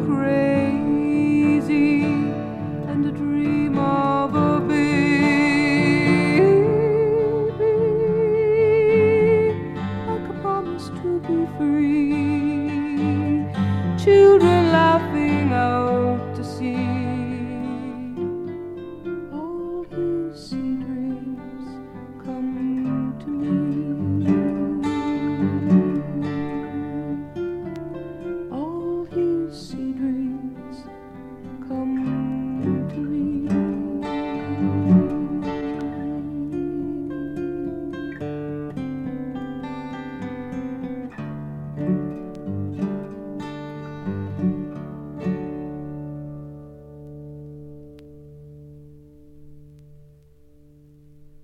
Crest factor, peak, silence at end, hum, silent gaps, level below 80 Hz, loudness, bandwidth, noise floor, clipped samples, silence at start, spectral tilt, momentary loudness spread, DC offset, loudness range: 18 dB; -4 dBFS; 0 s; none; none; -50 dBFS; -22 LUFS; 9.6 kHz; -51 dBFS; under 0.1%; 0 s; -8 dB/octave; 16 LU; under 0.1%; 12 LU